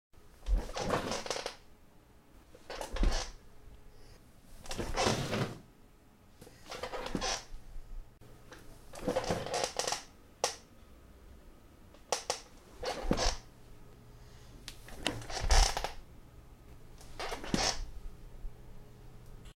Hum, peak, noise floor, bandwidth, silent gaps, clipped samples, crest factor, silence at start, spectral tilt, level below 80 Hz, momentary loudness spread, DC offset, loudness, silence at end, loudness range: none; -10 dBFS; -60 dBFS; 16 kHz; none; under 0.1%; 26 dB; 0.15 s; -3 dB/octave; -42 dBFS; 25 LU; under 0.1%; -36 LUFS; 0.05 s; 6 LU